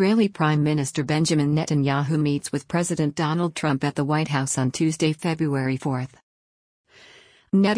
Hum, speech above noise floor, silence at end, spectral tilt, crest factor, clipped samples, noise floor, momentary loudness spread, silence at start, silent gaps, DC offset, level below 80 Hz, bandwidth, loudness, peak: none; 30 dB; 0 s; -5.5 dB/octave; 16 dB; under 0.1%; -52 dBFS; 4 LU; 0 s; 6.23-6.84 s; under 0.1%; -60 dBFS; 10.5 kHz; -23 LUFS; -8 dBFS